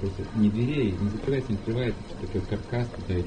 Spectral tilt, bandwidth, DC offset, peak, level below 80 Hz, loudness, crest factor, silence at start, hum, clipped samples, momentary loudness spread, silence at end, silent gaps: -8 dB/octave; 9.6 kHz; under 0.1%; -14 dBFS; -40 dBFS; -28 LUFS; 14 dB; 0 s; none; under 0.1%; 7 LU; 0 s; none